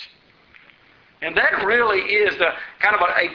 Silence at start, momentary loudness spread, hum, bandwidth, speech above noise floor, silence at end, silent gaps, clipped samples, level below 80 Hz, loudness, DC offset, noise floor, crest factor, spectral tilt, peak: 0 s; 5 LU; none; 6.6 kHz; 35 dB; 0 s; none; under 0.1%; -56 dBFS; -18 LUFS; under 0.1%; -54 dBFS; 20 dB; 0.5 dB/octave; -2 dBFS